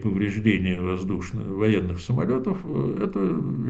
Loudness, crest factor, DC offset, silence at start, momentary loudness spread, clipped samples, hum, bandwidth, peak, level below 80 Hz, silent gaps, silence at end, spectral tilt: -25 LUFS; 18 dB; under 0.1%; 0 s; 6 LU; under 0.1%; none; 8 kHz; -6 dBFS; -46 dBFS; none; 0 s; -8 dB/octave